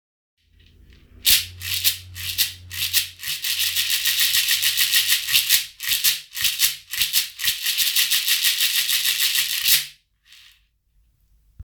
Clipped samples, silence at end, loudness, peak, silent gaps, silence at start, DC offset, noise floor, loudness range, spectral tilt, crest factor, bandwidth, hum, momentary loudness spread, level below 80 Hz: under 0.1%; 0 s; -18 LUFS; 0 dBFS; none; 1.25 s; under 0.1%; -63 dBFS; 3 LU; 3 dB/octave; 22 dB; over 20 kHz; none; 6 LU; -56 dBFS